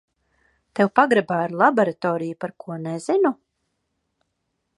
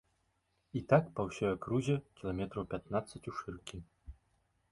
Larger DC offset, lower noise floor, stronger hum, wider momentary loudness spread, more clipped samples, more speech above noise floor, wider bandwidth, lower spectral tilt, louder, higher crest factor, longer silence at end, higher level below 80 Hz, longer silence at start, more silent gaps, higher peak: neither; about the same, -76 dBFS vs -78 dBFS; neither; about the same, 14 LU vs 16 LU; neither; first, 55 dB vs 43 dB; about the same, 11.5 kHz vs 11.5 kHz; about the same, -6.5 dB/octave vs -7 dB/octave; first, -21 LUFS vs -36 LUFS; about the same, 22 dB vs 24 dB; first, 1.45 s vs 0.6 s; second, -72 dBFS vs -58 dBFS; about the same, 0.75 s vs 0.75 s; neither; first, -2 dBFS vs -14 dBFS